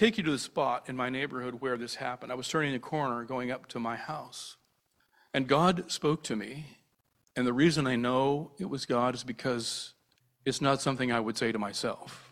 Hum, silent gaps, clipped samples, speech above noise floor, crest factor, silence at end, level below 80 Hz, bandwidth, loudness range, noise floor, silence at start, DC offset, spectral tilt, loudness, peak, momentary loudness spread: none; none; under 0.1%; 43 dB; 22 dB; 0.05 s; -64 dBFS; 15 kHz; 4 LU; -74 dBFS; 0 s; under 0.1%; -5 dB/octave; -31 LUFS; -10 dBFS; 12 LU